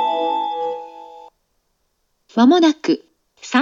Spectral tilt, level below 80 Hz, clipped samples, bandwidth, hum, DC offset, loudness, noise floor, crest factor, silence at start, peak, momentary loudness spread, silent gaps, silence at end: -4 dB/octave; -72 dBFS; under 0.1%; 7.6 kHz; none; under 0.1%; -18 LUFS; -68 dBFS; 18 dB; 0 s; -2 dBFS; 24 LU; none; 0 s